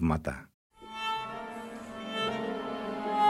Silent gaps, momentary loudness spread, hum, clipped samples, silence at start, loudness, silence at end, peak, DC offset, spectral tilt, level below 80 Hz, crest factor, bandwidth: 0.54-0.70 s; 11 LU; none; under 0.1%; 0 s; -35 LUFS; 0 s; -14 dBFS; under 0.1%; -6 dB/octave; -50 dBFS; 18 dB; 13.5 kHz